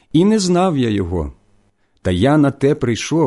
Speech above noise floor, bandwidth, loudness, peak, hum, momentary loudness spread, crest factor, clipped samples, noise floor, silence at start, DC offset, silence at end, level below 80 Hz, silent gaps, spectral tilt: 42 dB; 11.5 kHz; -16 LUFS; -4 dBFS; none; 10 LU; 12 dB; under 0.1%; -57 dBFS; 0.15 s; under 0.1%; 0 s; -36 dBFS; none; -6 dB/octave